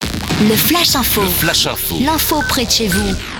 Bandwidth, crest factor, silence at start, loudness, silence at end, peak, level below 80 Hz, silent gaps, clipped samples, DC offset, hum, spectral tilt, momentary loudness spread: over 20 kHz; 14 dB; 0 s; -13 LUFS; 0 s; 0 dBFS; -30 dBFS; none; under 0.1%; under 0.1%; none; -3 dB/octave; 5 LU